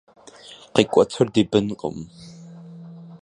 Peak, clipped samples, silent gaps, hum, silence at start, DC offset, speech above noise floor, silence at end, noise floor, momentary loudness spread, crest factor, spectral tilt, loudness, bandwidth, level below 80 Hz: 0 dBFS; under 0.1%; none; none; 0.5 s; under 0.1%; 25 dB; 0.05 s; -45 dBFS; 24 LU; 24 dB; -6 dB/octave; -21 LUFS; 11 kHz; -56 dBFS